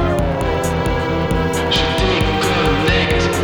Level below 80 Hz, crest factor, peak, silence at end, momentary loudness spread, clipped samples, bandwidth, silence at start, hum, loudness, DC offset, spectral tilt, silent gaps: -26 dBFS; 14 dB; -2 dBFS; 0 s; 4 LU; under 0.1%; over 20 kHz; 0 s; none; -16 LUFS; under 0.1%; -5 dB/octave; none